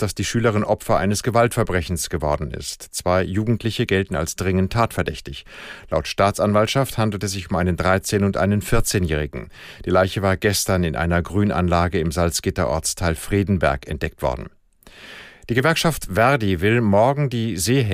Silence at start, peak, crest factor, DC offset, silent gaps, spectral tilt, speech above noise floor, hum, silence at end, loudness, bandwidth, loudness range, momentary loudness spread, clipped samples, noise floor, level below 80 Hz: 0 s; -4 dBFS; 16 dB; under 0.1%; none; -5 dB/octave; 26 dB; none; 0 s; -20 LUFS; 15.5 kHz; 2 LU; 10 LU; under 0.1%; -46 dBFS; -38 dBFS